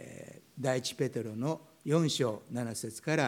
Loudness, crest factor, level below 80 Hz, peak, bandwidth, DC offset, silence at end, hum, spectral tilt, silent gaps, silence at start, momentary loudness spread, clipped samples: -34 LUFS; 18 dB; -76 dBFS; -14 dBFS; 17 kHz; under 0.1%; 0 s; none; -5 dB/octave; none; 0 s; 11 LU; under 0.1%